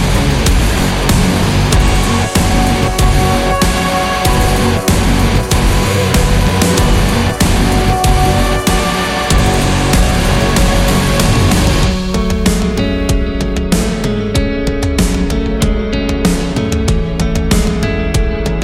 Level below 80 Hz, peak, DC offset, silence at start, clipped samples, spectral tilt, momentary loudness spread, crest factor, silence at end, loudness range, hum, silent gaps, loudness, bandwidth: -16 dBFS; 0 dBFS; under 0.1%; 0 s; under 0.1%; -5 dB/octave; 4 LU; 12 dB; 0 s; 3 LU; none; none; -13 LUFS; 16.5 kHz